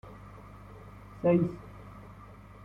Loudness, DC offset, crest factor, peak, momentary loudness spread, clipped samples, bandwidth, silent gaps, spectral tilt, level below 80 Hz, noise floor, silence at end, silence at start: -29 LUFS; under 0.1%; 20 dB; -14 dBFS; 23 LU; under 0.1%; 5.6 kHz; none; -10 dB/octave; -56 dBFS; -50 dBFS; 0 s; 0.05 s